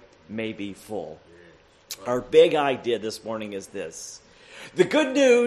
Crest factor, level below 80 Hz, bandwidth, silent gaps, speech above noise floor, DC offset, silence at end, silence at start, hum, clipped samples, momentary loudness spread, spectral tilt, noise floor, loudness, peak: 20 dB; -62 dBFS; 13 kHz; none; 30 dB; under 0.1%; 0 s; 0.3 s; none; under 0.1%; 20 LU; -4 dB/octave; -53 dBFS; -24 LUFS; -4 dBFS